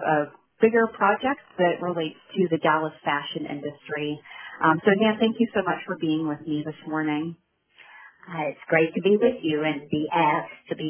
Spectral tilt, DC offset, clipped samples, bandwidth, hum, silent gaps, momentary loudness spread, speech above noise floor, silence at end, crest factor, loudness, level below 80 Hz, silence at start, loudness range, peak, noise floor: -10 dB/octave; under 0.1%; under 0.1%; 3.5 kHz; none; none; 11 LU; 30 dB; 0 s; 20 dB; -24 LUFS; -66 dBFS; 0 s; 4 LU; -6 dBFS; -54 dBFS